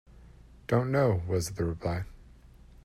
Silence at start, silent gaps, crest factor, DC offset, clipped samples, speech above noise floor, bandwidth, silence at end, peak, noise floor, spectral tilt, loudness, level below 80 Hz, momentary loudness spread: 0.15 s; none; 20 dB; under 0.1%; under 0.1%; 25 dB; 13.5 kHz; 0.55 s; -12 dBFS; -53 dBFS; -6.5 dB/octave; -30 LUFS; -50 dBFS; 13 LU